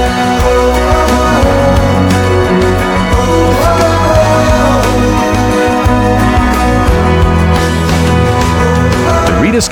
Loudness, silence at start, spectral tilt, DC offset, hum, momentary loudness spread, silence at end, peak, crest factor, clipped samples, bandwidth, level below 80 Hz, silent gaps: -9 LUFS; 0 s; -6 dB/octave; under 0.1%; none; 2 LU; 0 s; 0 dBFS; 8 dB; under 0.1%; 18 kHz; -16 dBFS; none